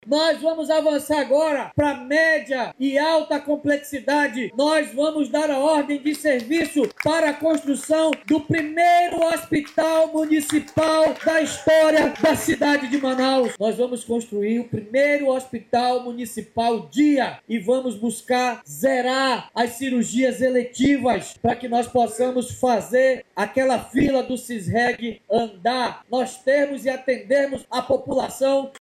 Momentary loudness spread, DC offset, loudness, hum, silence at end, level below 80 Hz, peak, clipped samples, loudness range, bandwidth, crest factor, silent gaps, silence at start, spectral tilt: 6 LU; under 0.1%; -21 LUFS; none; 0 s; -54 dBFS; -8 dBFS; under 0.1%; 3 LU; 15 kHz; 12 dB; none; 0.05 s; -4.5 dB/octave